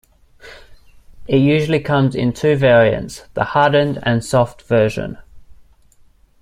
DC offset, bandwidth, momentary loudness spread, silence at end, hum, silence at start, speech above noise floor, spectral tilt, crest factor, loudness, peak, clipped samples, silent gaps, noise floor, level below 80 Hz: under 0.1%; 14.5 kHz; 11 LU; 0.9 s; none; 0.45 s; 35 dB; -6.5 dB/octave; 18 dB; -16 LUFS; 0 dBFS; under 0.1%; none; -50 dBFS; -44 dBFS